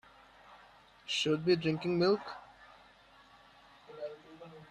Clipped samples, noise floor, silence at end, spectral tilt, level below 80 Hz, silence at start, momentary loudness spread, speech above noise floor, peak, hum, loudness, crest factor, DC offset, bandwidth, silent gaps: under 0.1%; -61 dBFS; 0.05 s; -5.5 dB/octave; -72 dBFS; 0.5 s; 23 LU; 30 dB; -16 dBFS; none; -32 LUFS; 20 dB; under 0.1%; 10.5 kHz; none